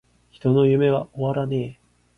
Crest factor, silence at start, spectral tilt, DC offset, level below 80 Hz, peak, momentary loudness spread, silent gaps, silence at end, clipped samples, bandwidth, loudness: 14 dB; 0.45 s; -9.5 dB/octave; under 0.1%; -54 dBFS; -8 dBFS; 10 LU; none; 0.45 s; under 0.1%; 4.6 kHz; -21 LUFS